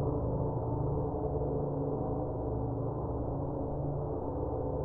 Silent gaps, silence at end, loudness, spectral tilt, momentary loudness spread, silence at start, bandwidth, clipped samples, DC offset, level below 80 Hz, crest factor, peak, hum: none; 0 s; -35 LUFS; -14 dB/octave; 3 LU; 0 s; 1.8 kHz; under 0.1%; under 0.1%; -42 dBFS; 12 dB; -22 dBFS; none